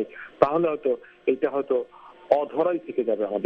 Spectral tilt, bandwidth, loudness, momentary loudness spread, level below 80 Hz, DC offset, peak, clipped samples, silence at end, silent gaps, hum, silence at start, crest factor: -8.5 dB/octave; 5.8 kHz; -25 LUFS; 6 LU; -64 dBFS; under 0.1%; 0 dBFS; under 0.1%; 0 s; none; none; 0 s; 24 dB